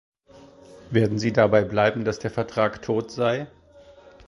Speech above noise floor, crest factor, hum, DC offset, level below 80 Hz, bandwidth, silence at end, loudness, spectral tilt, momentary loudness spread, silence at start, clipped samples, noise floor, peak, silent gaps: 28 dB; 20 dB; none; under 0.1%; -54 dBFS; 11.5 kHz; 0.8 s; -23 LUFS; -6.5 dB/octave; 8 LU; 0.75 s; under 0.1%; -50 dBFS; -4 dBFS; none